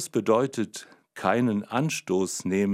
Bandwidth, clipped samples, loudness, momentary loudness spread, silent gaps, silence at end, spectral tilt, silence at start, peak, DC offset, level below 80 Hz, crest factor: 16 kHz; under 0.1%; -26 LUFS; 10 LU; none; 0 s; -5 dB/octave; 0 s; -8 dBFS; under 0.1%; -70 dBFS; 18 dB